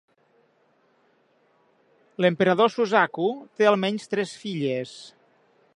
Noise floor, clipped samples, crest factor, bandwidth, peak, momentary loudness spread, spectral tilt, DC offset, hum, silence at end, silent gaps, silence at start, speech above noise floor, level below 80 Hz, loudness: -64 dBFS; under 0.1%; 22 dB; 11 kHz; -4 dBFS; 11 LU; -5.5 dB/octave; under 0.1%; none; 0.65 s; none; 2.2 s; 41 dB; -76 dBFS; -23 LUFS